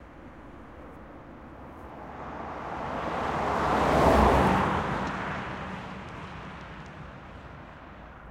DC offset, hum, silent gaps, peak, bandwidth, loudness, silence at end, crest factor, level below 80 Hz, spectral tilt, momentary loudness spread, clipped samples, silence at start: under 0.1%; none; none; -6 dBFS; 16.5 kHz; -27 LUFS; 0 s; 22 dB; -40 dBFS; -6.5 dB/octave; 25 LU; under 0.1%; 0 s